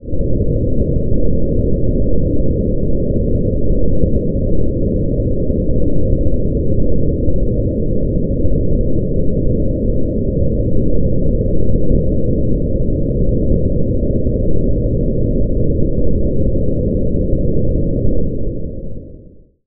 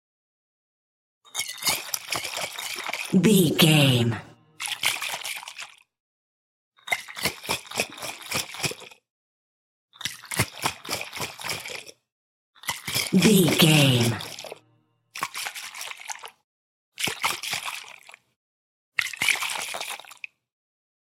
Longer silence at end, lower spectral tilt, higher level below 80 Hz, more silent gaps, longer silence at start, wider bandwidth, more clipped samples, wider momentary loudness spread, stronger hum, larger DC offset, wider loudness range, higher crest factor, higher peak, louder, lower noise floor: second, 0.5 s vs 1.2 s; first, -20 dB/octave vs -4 dB/octave; first, -18 dBFS vs -64 dBFS; second, none vs 6.00-6.72 s, 9.10-9.88 s, 12.12-12.53 s, 16.44-16.92 s, 18.36-18.92 s; second, 0.05 s vs 1.35 s; second, 0.7 kHz vs 16.5 kHz; neither; second, 1 LU vs 19 LU; neither; neither; second, 1 LU vs 9 LU; second, 12 dB vs 24 dB; first, 0 dBFS vs -4 dBFS; first, -18 LUFS vs -24 LUFS; second, -40 dBFS vs -66 dBFS